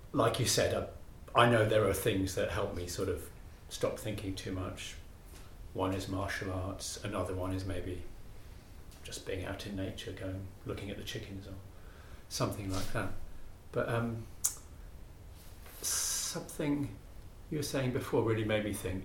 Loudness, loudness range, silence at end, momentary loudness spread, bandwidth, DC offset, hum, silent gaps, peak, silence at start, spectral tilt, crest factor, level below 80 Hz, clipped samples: -35 LUFS; 10 LU; 0 s; 24 LU; 17.5 kHz; under 0.1%; none; none; -10 dBFS; 0 s; -4.5 dB/octave; 26 dB; -50 dBFS; under 0.1%